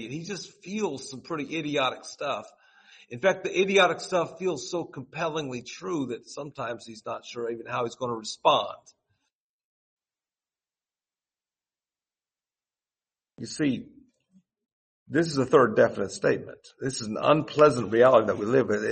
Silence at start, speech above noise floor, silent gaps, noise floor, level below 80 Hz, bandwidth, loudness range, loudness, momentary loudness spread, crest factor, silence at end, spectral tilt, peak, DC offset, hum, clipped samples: 0 s; over 64 dB; 9.33-9.97 s, 14.72-15.06 s; under -90 dBFS; -68 dBFS; 8.8 kHz; 14 LU; -26 LUFS; 16 LU; 22 dB; 0 s; -5 dB/octave; -6 dBFS; under 0.1%; none; under 0.1%